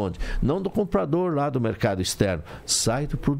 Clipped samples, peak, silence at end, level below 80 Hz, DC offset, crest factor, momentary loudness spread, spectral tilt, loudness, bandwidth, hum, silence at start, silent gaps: under 0.1%; -6 dBFS; 0 s; -36 dBFS; under 0.1%; 20 dB; 4 LU; -4.5 dB/octave; -25 LUFS; 16 kHz; none; 0 s; none